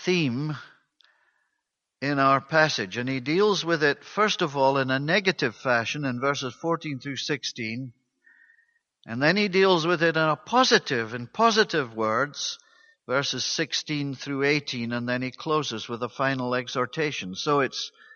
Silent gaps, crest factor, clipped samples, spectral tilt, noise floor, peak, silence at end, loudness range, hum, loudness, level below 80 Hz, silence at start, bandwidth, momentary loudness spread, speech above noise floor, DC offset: none; 22 dB; under 0.1%; -4 dB/octave; -81 dBFS; -4 dBFS; 0.25 s; 5 LU; none; -25 LUFS; -70 dBFS; 0 s; 7.2 kHz; 10 LU; 56 dB; under 0.1%